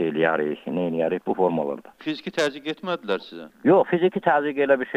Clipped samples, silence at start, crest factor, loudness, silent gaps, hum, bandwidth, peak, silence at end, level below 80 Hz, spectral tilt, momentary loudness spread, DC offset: under 0.1%; 0 s; 16 dB; -23 LUFS; none; none; 11 kHz; -6 dBFS; 0 s; -72 dBFS; -6 dB/octave; 11 LU; under 0.1%